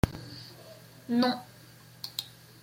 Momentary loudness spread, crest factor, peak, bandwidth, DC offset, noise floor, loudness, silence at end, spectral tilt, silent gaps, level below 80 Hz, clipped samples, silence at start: 23 LU; 26 dB; -8 dBFS; 16.5 kHz; under 0.1%; -53 dBFS; -32 LUFS; 0.35 s; -5.5 dB/octave; none; -48 dBFS; under 0.1%; 0.05 s